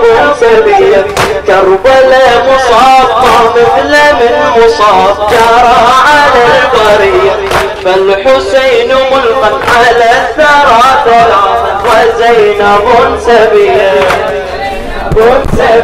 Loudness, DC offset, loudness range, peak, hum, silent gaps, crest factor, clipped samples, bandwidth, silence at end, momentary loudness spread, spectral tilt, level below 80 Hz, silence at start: -5 LUFS; under 0.1%; 2 LU; 0 dBFS; none; none; 4 dB; 4%; 16 kHz; 0 s; 5 LU; -4 dB/octave; -26 dBFS; 0 s